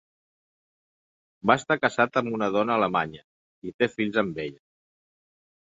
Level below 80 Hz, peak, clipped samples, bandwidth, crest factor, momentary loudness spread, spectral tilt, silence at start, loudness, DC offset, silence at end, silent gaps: -64 dBFS; -4 dBFS; under 0.1%; 8 kHz; 24 dB; 13 LU; -5.5 dB/octave; 1.45 s; -25 LUFS; under 0.1%; 1.1 s; 3.24-3.62 s, 3.74-3.79 s